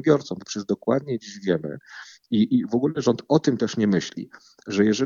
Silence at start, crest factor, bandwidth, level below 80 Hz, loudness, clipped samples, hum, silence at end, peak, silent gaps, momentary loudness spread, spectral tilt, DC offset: 0 s; 18 dB; 7.6 kHz; -64 dBFS; -24 LUFS; under 0.1%; none; 0 s; -4 dBFS; none; 17 LU; -6 dB/octave; under 0.1%